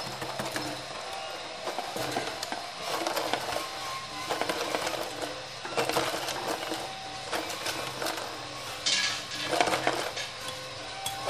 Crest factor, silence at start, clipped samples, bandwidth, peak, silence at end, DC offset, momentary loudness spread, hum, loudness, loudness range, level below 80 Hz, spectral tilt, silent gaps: 26 dB; 0 s; under 0.1%; 15.5 kHz; -6 dBFS; 0 s; 0.1%; 10 LU; none; -32 LUFS; 3 LU; -62 dBFS; -2 dB/octave; none